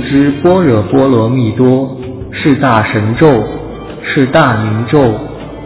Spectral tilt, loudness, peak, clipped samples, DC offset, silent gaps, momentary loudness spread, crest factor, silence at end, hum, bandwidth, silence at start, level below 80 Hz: -11.5 dB/octave; -10 LUFS; 0 dBFS; 0.5%; under 0.1%; none; 13 LU; 10 dB; 0 s; none; 4 kHz; 0 s; -34 dBFS